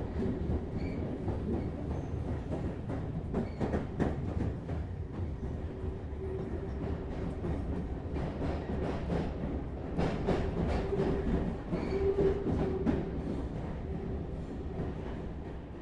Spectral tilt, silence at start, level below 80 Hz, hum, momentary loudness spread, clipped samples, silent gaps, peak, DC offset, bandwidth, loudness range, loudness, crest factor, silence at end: -9 dB/octave; 0 s; -42 dBFS; none; 7 LU; under 0.1%; none; -16 dBFS; under 0.1%; 9.6 kHz; 5 LU; -36 LUFS; 18 dB; 0 s